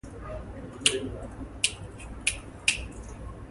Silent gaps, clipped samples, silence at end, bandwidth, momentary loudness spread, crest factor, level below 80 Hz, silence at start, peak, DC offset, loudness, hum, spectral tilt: none; under 0.1%; 0 s; 12 kHz; 16 LU; 30 dB; -44 dBFS; 0.05 s; -4 dBFS; under 0.1%; -29 LUFS; none; -1.5 dB/octave